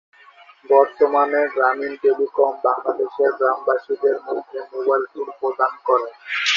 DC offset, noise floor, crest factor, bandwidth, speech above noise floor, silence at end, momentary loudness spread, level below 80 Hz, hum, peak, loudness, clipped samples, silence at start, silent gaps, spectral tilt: under 0.1%; -48 dBFS; 18 dB; 7.4 kHz; 29 dB; 0 s; 9 LU; -74 dBFS; none; -2 dBFS; -20 LUFS; under 0.1%; 0.7 s; none; -1.5 dB/octave